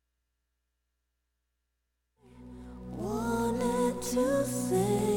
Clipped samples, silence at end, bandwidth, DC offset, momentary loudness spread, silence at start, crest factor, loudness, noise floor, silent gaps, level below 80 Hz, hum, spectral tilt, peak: under 0.1%; 0 s; 17.5 kHz; under 0.1%; 18 LU; 2.35 s; 16 dB; -30 LUFS; -82 dBFS; none; -52 dBFS; 60 Hz at -60 dBFS; -5.5 dB/octave; -16 dBFS